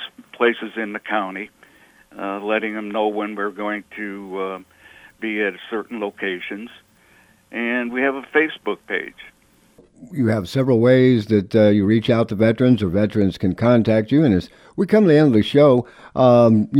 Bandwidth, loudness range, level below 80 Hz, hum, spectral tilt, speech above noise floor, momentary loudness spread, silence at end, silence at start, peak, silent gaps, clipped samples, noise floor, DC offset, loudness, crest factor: 12.5 kHz; 10 LU; -54 dBFS; none; -8 dB/octave; 36 dB; 16 LU; 0 s; 0 s; -2 dBFS; none; under 0.1%; -54 dBFS; under 0.1%; -19 LUFS; 16 dB